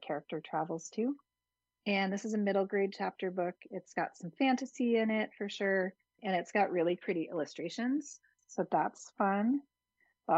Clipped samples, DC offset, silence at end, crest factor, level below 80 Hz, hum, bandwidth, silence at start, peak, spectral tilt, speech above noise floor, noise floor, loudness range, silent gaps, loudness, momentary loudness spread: under 0.1%; under 0.1%; 0 s; 18 dB; -86 dBFS; none; 8.2 kHz; 0 s; -16 dBFS; -5.5 dB/octave; over 56 dB; under -90 dBFS; 2 LU; none; -34 LUFS; 9 LU